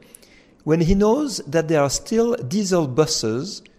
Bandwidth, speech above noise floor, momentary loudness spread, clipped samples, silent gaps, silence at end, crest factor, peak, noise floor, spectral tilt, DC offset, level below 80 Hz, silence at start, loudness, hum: 15.5 kHz; 32 dB; 5 LU; under 0.1%; none; 0.2 s; 16 dB; -4 dBFS; -51 dBFS; -5 dB/octave; under 0.1%; -36 dBFS; 0.65 s; -20 LUFS; none